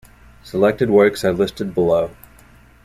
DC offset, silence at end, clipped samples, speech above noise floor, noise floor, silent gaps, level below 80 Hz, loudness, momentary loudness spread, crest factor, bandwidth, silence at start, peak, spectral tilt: under 0.1%; 0.7 s; under 0.1%; 31 dB; -47 dBFS; none; -46 dBFS; -18 LUFS; 8 LU; 16 dB; 15 kHz; 0.45 s; -2 dBFS; -6.5 dB/octave